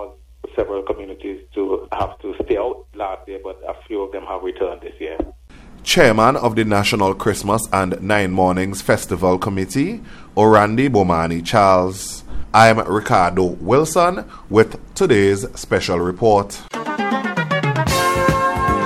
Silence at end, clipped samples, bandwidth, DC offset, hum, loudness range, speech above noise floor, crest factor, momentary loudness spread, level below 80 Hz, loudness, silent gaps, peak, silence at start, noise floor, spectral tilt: 0 s; under 0.1%; 16 kHz; under 0.1%; none; 10 LU; 23 dB; 18 dB; 15 LU; -38 dBFS; -17 LUFS; none; 0 dBFS; 0 s; -40 dBFS; -5 dB/octave